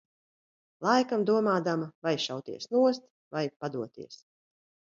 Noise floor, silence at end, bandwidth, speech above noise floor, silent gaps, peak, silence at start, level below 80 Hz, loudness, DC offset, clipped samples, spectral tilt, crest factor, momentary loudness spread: under -90 dBFS; 0.8 s; 7.6 kHz; over 61 dB; 1.95-2.02 s, 3.10-3.31 s, 3.56-3.60 s; -10 dBFS; 0.8 s; -78 dBFS; -29 LUFS; under 0.1%; under 0.1%; -5.5 dB/octave; 20 dB; 13 LU